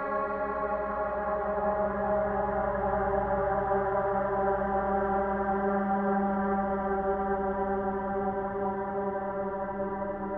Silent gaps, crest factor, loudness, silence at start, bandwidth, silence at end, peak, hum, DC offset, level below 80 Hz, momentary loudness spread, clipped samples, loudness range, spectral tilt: none; 14 dB; -30 LUFS; 0 s; 4.1 kHz; 0 s; -16 dBFS; none; under 0.1%; -48 dBFS; 4 LU; under 0.1%; 2 LU; -11 dB/octave